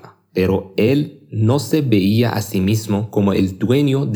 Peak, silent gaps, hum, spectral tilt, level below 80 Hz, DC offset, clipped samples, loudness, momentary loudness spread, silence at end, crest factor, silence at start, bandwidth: -2 dBFS; none; none; -7 dB/octave; -52 dBFS; under 0.1%; under 0.1%; -18 LUFS; 5 LU; 0 s; 16 dB; 0.35 s; 19.5 kHz